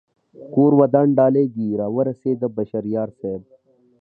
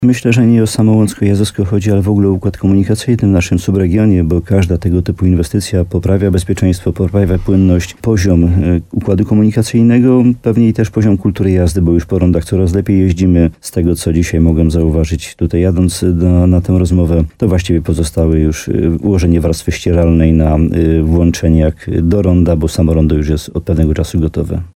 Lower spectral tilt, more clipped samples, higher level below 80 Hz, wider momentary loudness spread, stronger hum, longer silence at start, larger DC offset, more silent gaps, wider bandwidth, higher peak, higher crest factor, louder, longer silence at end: first, -13 dB/octave vs -7.5 dB/octave; neither; second, -62 dBFS vs -22 dBFS; first, 12 LU vs 4 LU; neither; first, 0.4 s vs 0 s; neither; neither; second, 2.8 kHz vs 15 kHz; about the same, -2 dBFS vs 0 dBFS; first, 18 dB vs 10 dB; second, -19 LUFS vs -12 LUFS; first, 0.6 s vs 0.05 s